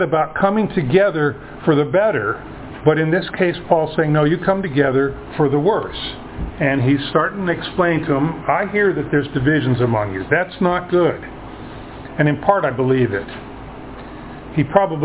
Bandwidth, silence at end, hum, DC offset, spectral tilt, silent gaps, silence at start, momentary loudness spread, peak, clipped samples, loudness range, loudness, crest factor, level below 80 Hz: 4 kHz; 0 s; none; under 0.1%; -11 dB/octave; none; 0 s; 17 LU; 0 dBFS; under 0.1%; 2 LU; -18 LUFS; 18 dB; -42 dBFS